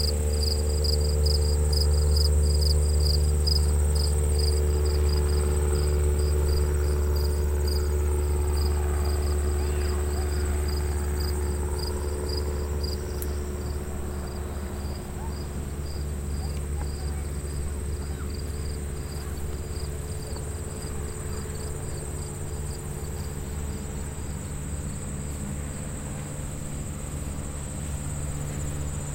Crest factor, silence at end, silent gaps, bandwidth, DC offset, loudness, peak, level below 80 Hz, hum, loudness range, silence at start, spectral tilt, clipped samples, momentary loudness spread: 14 dB; 0 s; none; 16.5 kHz; under 0.1%; -28 LUFS; -12 dBFS; -28 dBFS; none; 10 LU; 0 s; -5 dB/octave; under 0.1%; 11 LU